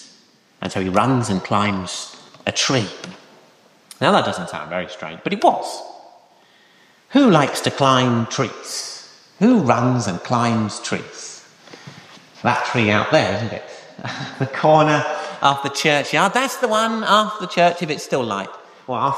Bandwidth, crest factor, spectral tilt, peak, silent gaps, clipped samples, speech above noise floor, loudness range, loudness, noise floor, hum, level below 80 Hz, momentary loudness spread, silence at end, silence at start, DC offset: 15 kHz; 18 dB; -4.5 dB/octave; -2 dBFS; none; under 0.1%; 35 dB; 5 LU; -19 LUFS; -53 dBFS; none; -60 dBFS; 17 LU; 0 s; 0 s; under 0.1%